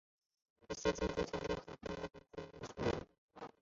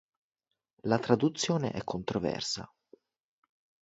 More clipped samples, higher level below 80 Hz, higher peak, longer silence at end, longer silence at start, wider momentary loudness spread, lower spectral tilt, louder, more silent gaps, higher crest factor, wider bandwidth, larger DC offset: neither; first, -56 dBFS vs -62 dBFS; second, -22 dBFS vs -8 dBFS; second, 0.15 s vs 1.15 s; second, 0.7 s vs 0.85 s; first, 14 LU vs 10 LU; about the same, -4.5 dB/octave vs -5 dB/octave; second, -42 LUFS vs -31 LUFS; first, 3.18-3.28 s vs none; about the same, 20 dB vs 24 dB; about the same, 7.6 kHz vs 8 kHz; neither